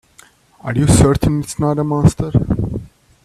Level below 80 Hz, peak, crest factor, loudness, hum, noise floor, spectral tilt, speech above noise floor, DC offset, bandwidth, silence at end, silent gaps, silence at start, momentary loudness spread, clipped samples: -30 dBFS; 0 dBFS; 16 dB; -16 LUFS; none; -48 dBFS; -6.5 dB/octave; 34 dB; under 0.1%; 14 kHz; 0.4 s; none; 0.65 s; 12 LU; under 0.1%